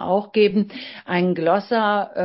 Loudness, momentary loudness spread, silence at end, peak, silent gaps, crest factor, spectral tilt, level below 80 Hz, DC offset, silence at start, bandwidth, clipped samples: -20 LUFS; 8 LU; 0 s; -4 dBFS; none; 16 dB; -11 dB/octave; -62 dBFS; under 0.1%; 0 s; 5.8 kHz; under 0.1%